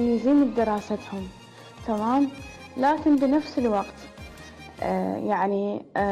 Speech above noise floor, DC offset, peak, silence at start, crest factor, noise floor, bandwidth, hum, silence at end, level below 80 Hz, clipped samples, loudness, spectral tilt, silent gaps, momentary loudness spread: 20 dB; under 0.1%; -14 dBFS; 0 s; 12 dB; -44 dBFS; 11.5 kHz; none; 0 s; -52 dBFS; under 0.1%; -24 LUFS; -7 dB/octave; none; 22 LU